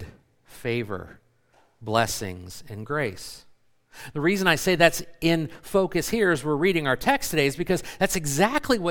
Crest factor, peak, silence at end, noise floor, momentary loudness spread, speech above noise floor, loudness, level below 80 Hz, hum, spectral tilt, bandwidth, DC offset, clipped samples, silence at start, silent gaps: 22 dB; -2 dBFS; 0 s; -62 dBFS; 16 LU; 38 dB; -24 LUFS; -48 dBFS; none; -4.5 dB/octave; 18 kHz; under 0.1%; under 0.1%; 0 s; none